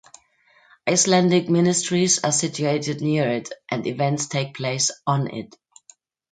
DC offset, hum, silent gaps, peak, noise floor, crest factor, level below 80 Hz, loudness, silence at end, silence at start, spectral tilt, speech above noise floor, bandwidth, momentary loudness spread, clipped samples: under 0.1%; none; none; -6 dBFS; -58 dBFS; 18 dB; -66 dBFS; -21 LUFS; 0.85 s; 0.85 s; -4 dB/octave; 37 dB; 9.4 kHz; 11 LU; under 0.1%